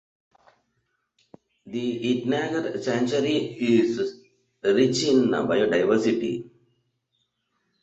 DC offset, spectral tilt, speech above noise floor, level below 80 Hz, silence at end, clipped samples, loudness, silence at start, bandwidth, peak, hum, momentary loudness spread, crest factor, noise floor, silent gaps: under 0.1%; -5 dB/octave; 52 dB; -64 dBFS; 1.35 s; under 0.1%; -24 LUFS; 1.65 s; 8.2 kHz; -8 dBFS; none; 9 LU; 18 dB; -75 dBFS; none